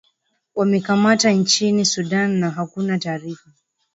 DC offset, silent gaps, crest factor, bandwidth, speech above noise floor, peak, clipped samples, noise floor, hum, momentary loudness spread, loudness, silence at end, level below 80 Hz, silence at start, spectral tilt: under 0.1%; none; 18 dB; 8 kHz; 49 dB; -2 dBFS; under 0.1%; -67 dBFS; none; 14 LU; -18 LUFS; 0.6 s; -64 dBFS; 0.55 s; -4 dB/octave